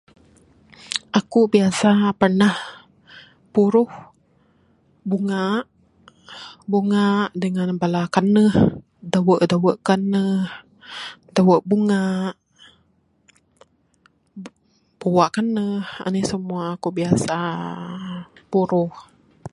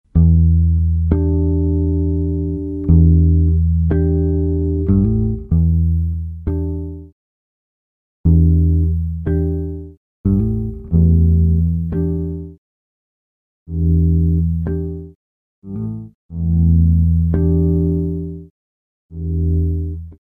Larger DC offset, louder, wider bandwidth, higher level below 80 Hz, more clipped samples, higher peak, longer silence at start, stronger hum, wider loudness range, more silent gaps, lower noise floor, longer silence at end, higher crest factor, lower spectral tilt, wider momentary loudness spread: neither; second, -20 LUFS vs -17 LUFS; first, 11.5 kHz vs 1.7 kHz; second, -54 dBFS vs -22 dBFS; neither; about the same, 0 dBFS vs 0 dBFS; first, 0.85 s vs 0.15 s; neither; about the same, 6 LU vs 5 LU; second, none vs 7.12-8.24 s, 9.97-10.24 s, 12.58-13.66 s, 15.15-15.62 s, 16.15-16.29 s, 18.50-19.09 s; second, -62 dBFS vs under -90 dBFS; about the same, 0.05 s vs 0.15 s; about the same, 20 dB vs 16 dB; second, -6.5 dB/octave vs -13.5 dB/octave; first, 18 LU vs 14 LU